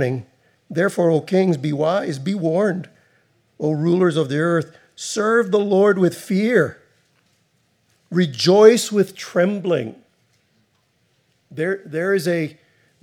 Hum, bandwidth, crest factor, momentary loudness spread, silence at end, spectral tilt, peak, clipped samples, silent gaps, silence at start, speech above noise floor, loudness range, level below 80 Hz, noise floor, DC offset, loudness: none; 16 kHz; 20 dB; 11 LU; 0.5 s; -6 dB/octave; 0 dBFS; under 0.1%; none; 0 s; 46 dB; 6 LU; -76 dBFS; -64 dBFS; under 0.1%; -19 LUFS